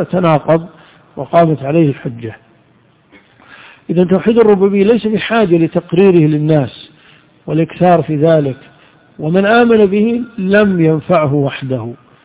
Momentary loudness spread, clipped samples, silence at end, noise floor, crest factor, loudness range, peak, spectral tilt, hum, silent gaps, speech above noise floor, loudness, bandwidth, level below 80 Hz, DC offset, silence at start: 14 LU; 0.5%; 0.3 s; -50 dBFS; 12 dB; 5 LU; 0 dBFS; -11.5 dB/octave; none; none; 39 dB; -12 LUFS; 4 kHz; -48 dBFS; under 0.1%; 0 s